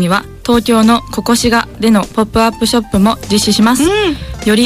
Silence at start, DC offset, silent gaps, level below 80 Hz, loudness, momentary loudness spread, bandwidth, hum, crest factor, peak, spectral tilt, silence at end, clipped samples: 0 s; under 0.1%; none; -32 dBFS; -12 LUFS; 5 LU; 15.5 kHz; none; 10 dB; -2 dBFS; -4.5 dB/octave; 0 s; under 0.1%